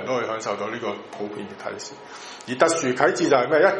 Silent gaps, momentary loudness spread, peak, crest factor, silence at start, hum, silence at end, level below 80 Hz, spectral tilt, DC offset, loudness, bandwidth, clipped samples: none; 18 LU; -2 dBFS; 20 dB; 0 s; none; 0 s; -68 dBFS; -4 dB/octave; under 0.1%; -23 LUFS; 11 kHz; under 0.1%